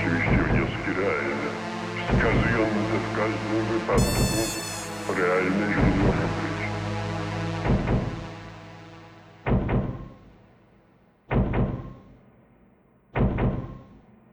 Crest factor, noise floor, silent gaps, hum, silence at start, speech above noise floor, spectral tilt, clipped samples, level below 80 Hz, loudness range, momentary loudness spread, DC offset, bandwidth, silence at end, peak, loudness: 18 dB; -59 dBFS; none; none; 0 s; 36 dB; -6 dB/octave; under 0.1%; -36 dBFS; 7 LU; 17 LU; under 0.1%; 16 kHz; 0.35 s; -8 dBFS; -26 LUFS